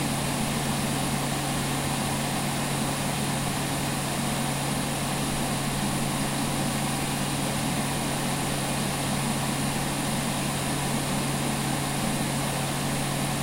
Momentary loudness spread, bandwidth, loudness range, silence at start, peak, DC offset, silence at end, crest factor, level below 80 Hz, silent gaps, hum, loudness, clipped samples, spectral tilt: 1 LU; 16 kHz; 0 LU; 0 s; -14 dBFS; under 0.1%; 0 s; 14 dB; -44 dBFS; none; none; -27 LUFS; under 0.1%; -4 dB/octave